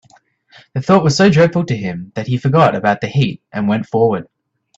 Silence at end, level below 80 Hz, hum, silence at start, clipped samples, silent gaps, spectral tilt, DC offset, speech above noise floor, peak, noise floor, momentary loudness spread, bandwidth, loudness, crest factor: 0.55 s; -50 dBFS; none; 0.75 s; under 0.1%; none; -6.5 dB/octave; under 0.1%; 37 dB; 0 dBFS; -52 dBFS; 13 LU; 8 kHz; -15 LUFS; 16 dB